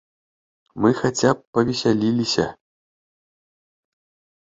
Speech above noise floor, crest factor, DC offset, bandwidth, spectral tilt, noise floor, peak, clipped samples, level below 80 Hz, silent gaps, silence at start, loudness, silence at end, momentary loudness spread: over 70 dB; 20 dB; under 0.1%; 8 kHz; -5 dB/octave; under -90 dBFS; -2 dBFS; under 0.1%; -56 dBFS; 1.47-1.53 s; 0.75 s; -21 LUFS; 1.9 s; 3 LU